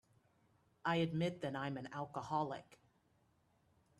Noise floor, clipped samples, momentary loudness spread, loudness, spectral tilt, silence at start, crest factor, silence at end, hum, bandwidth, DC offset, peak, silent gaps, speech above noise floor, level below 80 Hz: -76 dBFS; under 0.1%; 9 LU; -41 LUFS; -6.5 dB/octave; 0.85 s; 20 dB; 1.25 s; none; 11.5 kHz; under 0.1%; -24 dBFS; none; 36 dB; -76 dBFS